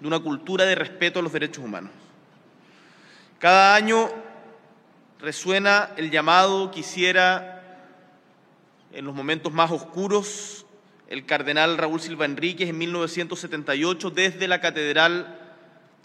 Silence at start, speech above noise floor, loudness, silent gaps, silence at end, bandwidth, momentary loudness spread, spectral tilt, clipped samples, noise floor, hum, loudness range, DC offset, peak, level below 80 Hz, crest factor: 0 s; 35 dB; -21 LUFS; none; 0.6 s; 13 kHz; 17 LU; -3.5 dB/octave; under 0.1%; -57 dBFS; none; 6 LU; under 0.1%; -2 dBFS; -76 dBFS; 22 dB